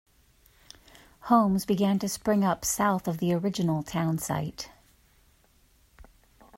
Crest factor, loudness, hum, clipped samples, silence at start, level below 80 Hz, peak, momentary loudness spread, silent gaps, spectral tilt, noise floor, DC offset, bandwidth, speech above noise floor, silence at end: 20 dB; -27 LUFS; none; under 0.1%; 1.25 s; -56 dBFS; -10 dBFS; 10 LU; none; -5.5 dB/octave; -63 dBFS; under 0.1%; 16 kHz; 37 dB; 1.9 s